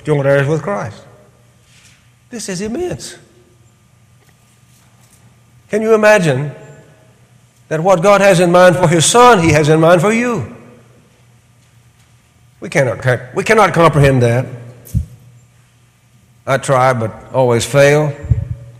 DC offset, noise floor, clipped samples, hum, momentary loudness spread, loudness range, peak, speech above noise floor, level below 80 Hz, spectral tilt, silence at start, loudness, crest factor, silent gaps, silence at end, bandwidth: under 0.1%; -50 dBFS; under 0.1%; none; 17 LU; 17 LU; 0 dBFS; 39 dB; -38 dBFS; -5 dB/octave; 0.05 s; -12 LUFS; 14 dB; none; 0.1 s; 16 kHz